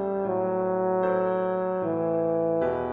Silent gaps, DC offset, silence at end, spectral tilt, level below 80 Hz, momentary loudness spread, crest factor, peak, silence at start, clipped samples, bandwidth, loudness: none; under 0.1%; 0 s; -11 dB/octave; -60 dBFS; 3 LU; 12 dB; -12 dBFS; 0 s; under 0.1%; 4 kHz; -26 LUFS